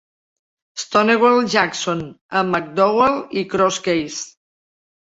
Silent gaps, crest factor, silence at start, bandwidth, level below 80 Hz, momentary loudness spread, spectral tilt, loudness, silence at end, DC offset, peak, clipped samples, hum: 2.21-2.29 s; 18 dB; 0.75 s; 8 kHz; -56 dBFS; 14 LU; -4 dB/octave; -18 LUFS; 0.8 s; under 0.1%; -2 dBFS; under 0.1%; none